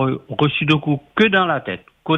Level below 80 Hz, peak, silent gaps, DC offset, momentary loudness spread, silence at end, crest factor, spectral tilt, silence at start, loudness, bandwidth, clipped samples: -54 dBFS; -2 dBFS; none; under 0.1%; 11 LU; 0 s; 16 dB; -7.5 dB/octave; 0 s; -18 LUFS; 7 kHz; under 0.1%